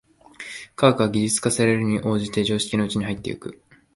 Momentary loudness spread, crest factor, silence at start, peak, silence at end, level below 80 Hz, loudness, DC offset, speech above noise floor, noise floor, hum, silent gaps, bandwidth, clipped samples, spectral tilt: 16 LU; 20 dB; 0.4 s; -2 dBFS; 0.4 s; -52 dBFS; -22 LUFS; under 0.1%; 20 dB; -41 dBFS; none; none; 11.5 kHz; under 0.1%; -4.5 dB/octave